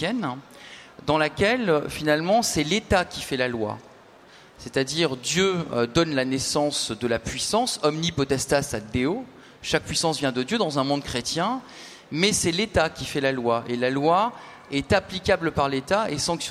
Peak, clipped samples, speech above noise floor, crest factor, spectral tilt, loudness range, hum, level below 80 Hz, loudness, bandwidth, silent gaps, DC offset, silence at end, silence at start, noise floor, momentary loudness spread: -6 dBFS; under 0.1%; 26 dB; 18 dB; -4 dB/octave; 2 LU; none; -48 dBFS; -24 LUFS; 16 kHz; none; under 0.1%; 0 s; 0 s; -50 dBFS; 11 LU